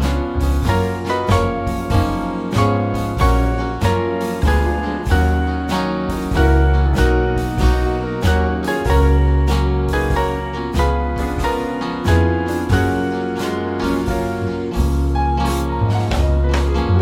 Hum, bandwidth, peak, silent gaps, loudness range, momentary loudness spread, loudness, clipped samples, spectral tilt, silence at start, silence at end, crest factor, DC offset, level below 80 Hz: none; 16 kHz; -2 dBFS; none; 2 LU; 6 LU; -18 LUFS; under 0.1%; -7 dB/octave; 0 s; 0 s; 14 dB; under 0.1%; -20 dBFS